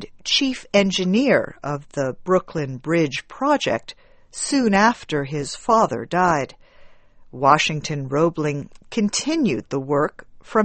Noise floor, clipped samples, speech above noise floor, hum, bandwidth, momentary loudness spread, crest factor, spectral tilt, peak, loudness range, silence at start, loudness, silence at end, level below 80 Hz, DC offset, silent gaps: -46 dBFS; under 0.1%; 25 dB; none; 8.8 kHz; 10 LU; 22 dB; -4.5 dB/octave; 0 dBFS; 2 LU; 0 s; -21 LUFS; 0 s; -52 dBFS; under 0.1%; none